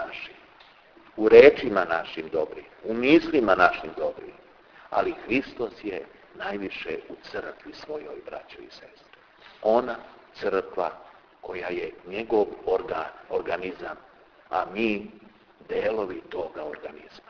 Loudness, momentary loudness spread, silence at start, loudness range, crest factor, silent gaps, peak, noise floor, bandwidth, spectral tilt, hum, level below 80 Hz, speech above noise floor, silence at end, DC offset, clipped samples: -25 LUFS; 21 LU; 0 s; 12 LU; 26 dB; none; 0 dBFS; -54 dBFS; 5.4 kHz; -6.5 dB/octave; none; -58 dBFS; 29 dB; 0.1 s; under 0.1%; under 0.1%